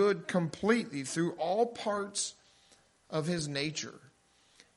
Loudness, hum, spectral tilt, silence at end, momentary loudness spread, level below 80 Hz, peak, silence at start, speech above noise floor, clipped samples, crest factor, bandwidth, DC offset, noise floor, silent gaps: -33 LUFS; none; -4.5 dB/octave; 0.7 s; 7 LU; -72 dBFS; -14 dBFS; 0 s; 35 dB; under 0.1%; 20 dB; 11.5 kHz; under 0.1%; -67 dBFS; none